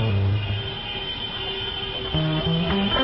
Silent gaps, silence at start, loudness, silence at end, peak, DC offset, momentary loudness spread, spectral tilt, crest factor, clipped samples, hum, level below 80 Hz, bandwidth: none; 0 s; -25 LUFS; 0 s; -10 dBFS; under 0.1%; 6 LU; -10.5 dB/octave; 14 dB; under 0.1%; none; -36 dBFS; 5.8 kHz